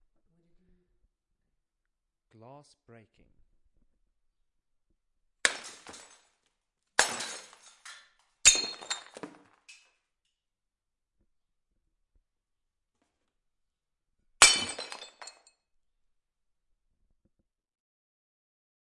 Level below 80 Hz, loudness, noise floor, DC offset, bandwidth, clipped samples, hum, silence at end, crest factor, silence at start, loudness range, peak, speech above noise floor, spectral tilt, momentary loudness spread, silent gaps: -64 dBFS; -25 LUFS; -87 dBFS; under 0.1%; 11.5 kHz; under 0.1%; none; 3.55 s; 34 dB; 5.45 s; 10 LU; -2 dBFS; 34 dB; 1.5 dB/octave; 29 LU; none